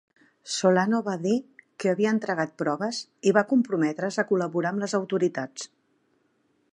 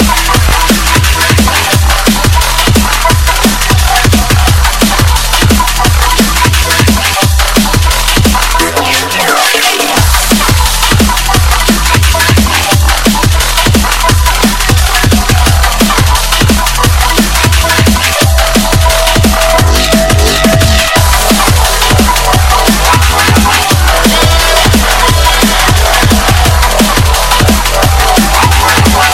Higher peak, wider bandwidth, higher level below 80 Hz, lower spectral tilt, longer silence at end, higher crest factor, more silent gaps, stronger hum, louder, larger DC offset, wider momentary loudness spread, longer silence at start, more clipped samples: second, -6 dBFS vs 0 dBFS; second, 11 kHz vs 17.5 kHz; second, -78 dBFS vs -12 dBFS; first, -5 dB/octave vs -3.5 dB/octave; first, 1.05 s vs 0 s; first, 20 dB vs 8 dB; neither; neither; second, -26 LUFS vs -7 LUFS; second, under 0.1% vs 2%; first, 9 LU vs 2 LU; first, 0.45 s vs 0 s; second, under 0.1% vs 1%